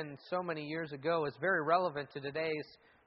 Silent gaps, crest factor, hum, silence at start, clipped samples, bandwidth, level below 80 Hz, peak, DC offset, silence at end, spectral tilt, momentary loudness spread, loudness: none; 18 dB; none; 0 s; under 0.1%; 5.8 kHz; -76 dBFS; -18 dBFS; under 0.1%; 0.3 s; -3.5 dB/octave; 10 LU; -35 LUFS